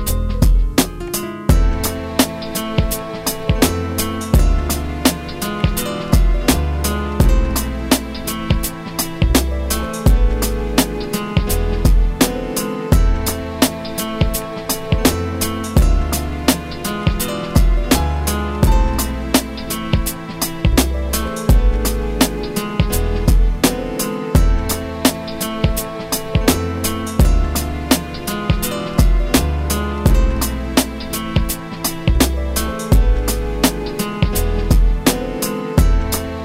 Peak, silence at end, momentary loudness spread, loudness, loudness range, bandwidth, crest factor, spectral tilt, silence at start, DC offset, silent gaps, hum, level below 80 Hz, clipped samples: 0 dBFS; 0 s; 6 LU; -18 LUFS; 1 LU; 16.5 kHz; 16 dB; -5 dB/octave; 0 s; under 0.1%; none; none; -18 dBFS; under 0.1%